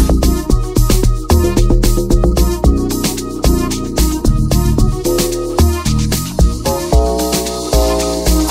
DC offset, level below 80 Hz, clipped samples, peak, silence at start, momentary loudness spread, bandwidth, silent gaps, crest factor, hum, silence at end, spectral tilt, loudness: under 0.1%; -16 dBFS; under 0.1%; 0 dBFS; 0 s; 3 LU; 16.5 kHz; none; 12 dB; none; 0 s; -5.5 dB/octave; -14 LUFS